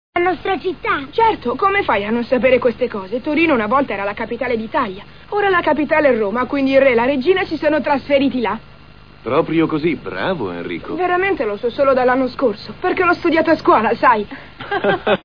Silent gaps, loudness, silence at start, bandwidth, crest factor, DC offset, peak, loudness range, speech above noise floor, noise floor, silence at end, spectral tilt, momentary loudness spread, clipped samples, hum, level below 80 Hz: none; -17 LUFS; 0.15 s; 5.4 kHz; 16 dB; 0.7%; -2 dBFS; 3 LU; 26 dB; -43 dBFS; 0.05 s; -7.5 dB/octave; 9 LU; under 0.1%; none; -44 dBFS